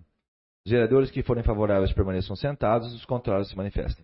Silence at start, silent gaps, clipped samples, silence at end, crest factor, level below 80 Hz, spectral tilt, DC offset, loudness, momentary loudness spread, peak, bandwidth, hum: 0.65 s; none; under 0.1%; 0.1 s; 16 dB; -36 dBFS; -11.5 dB/octave; under 0.1%; -26 LUFS; 9 LU; -10 dBFS; 5.8 kHz; none